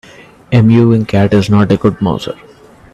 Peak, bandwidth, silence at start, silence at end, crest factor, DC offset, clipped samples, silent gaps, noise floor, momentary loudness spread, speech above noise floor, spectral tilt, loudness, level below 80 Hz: 0 dBFS; 10.5 kHz; 0.5 s; 0.6 s; 12 dB; under 0.1%; under 0.1%; none; -34 dBFS; 12 LU; 25 dB; -8 dB/octave; -11 LUFS; -40 dBFS